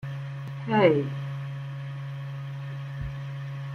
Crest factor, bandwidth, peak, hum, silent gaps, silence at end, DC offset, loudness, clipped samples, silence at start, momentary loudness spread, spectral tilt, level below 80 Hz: 22 dB; 6.6 kHz; -6 dBFS; none; none; 0 s; under 0.1%; -30 LUFS; under 0.1%; 0 s; 14 LU; -8.5 dB/octave; -52 dBFS